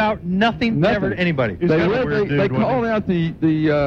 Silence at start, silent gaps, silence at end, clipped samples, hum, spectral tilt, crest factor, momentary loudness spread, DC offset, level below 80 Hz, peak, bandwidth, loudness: 0 s; none; 0 s; under 0.1%; none; -8 dB/octave; 14 dB; 2 LU; under 0.1%; -42 dBFS; -4 dBFS; 7 kHz; -19 LUFS